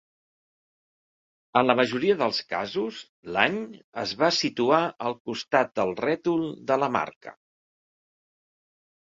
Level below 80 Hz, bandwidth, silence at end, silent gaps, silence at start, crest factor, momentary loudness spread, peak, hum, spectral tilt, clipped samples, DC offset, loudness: -68 dBFS; 7.8 kHz; 1.7 s; 3.09-3.23 s, 3.84-3.92 s, 5.20-5.25 s, 7.16-7.21 s; 1.55 s; 24 dB; 11 LU; -2 dBFS; none; -4.5 dB/octave; under 0.1%; under 0.1%; -25 LUFS